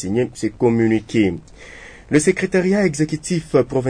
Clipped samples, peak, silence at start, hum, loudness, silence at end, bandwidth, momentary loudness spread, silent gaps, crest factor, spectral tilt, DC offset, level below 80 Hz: under 0.1%; -2 dBFS; 0 s; none; -18 LUFS; 0 s; 10 kHz; 14 LU; none; 16 dB; -6 dB/octave; under 0.1%; -46 dBFS